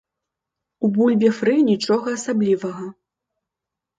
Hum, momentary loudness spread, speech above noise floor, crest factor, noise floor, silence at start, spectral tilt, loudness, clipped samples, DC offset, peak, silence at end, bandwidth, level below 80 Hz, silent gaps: none; 11 LU; 67 dB; 16 dB; -85 dBFS; 0.8 s; -6 dB/octave; -19 LUFS; under 0.1%; under 0.1%; -4 dBFS; 1.05 s; 9.2 kHz; -68 dBFS; none